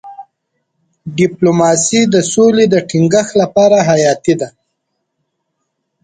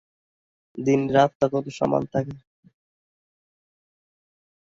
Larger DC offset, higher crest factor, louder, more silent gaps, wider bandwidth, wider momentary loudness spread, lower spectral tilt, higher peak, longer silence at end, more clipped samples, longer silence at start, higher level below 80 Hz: neither; second, 14 dB vs 22 dB; first, -11 LUFS vs -23 LUFS; second, none vs 1.35-1.40 s; first, 9.6 kHz vs 7.8 kHz; second, 7 LU vs 17 LU; second, -5 dB/octave vs -7 dB/octave; first, 0 dBFS vs -4 dBFS; second, 1.55 s vs 2.3 s; neither; second, 0.05 s vs 0.75 s; first, -54 dBFS vs -60 dBFS